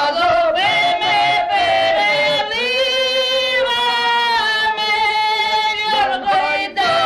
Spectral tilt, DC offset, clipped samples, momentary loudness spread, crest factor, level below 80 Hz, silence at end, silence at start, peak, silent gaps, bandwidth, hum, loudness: -2 dB/octave; under 0.1%; under 0.1%; 2 LU; 10 dB; -52 dBFS; 0 s; 0 s; -6 dBFS; none; 14 kHz; none; -15 LUFS